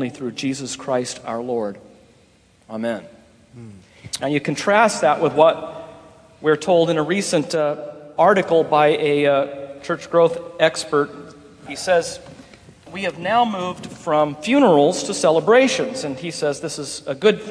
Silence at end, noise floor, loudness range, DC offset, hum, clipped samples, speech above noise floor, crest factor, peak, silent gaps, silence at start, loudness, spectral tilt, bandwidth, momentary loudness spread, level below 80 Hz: 0 s; -54 dBFS; 9 LU; under 0.1%; none; under 0.1%; 36 dB; 20 dB; 0 dBFS; none; 0 s; -19 LUFS; -4.5 dB/octave; 11 kHz; 14 LU; -60 dBFS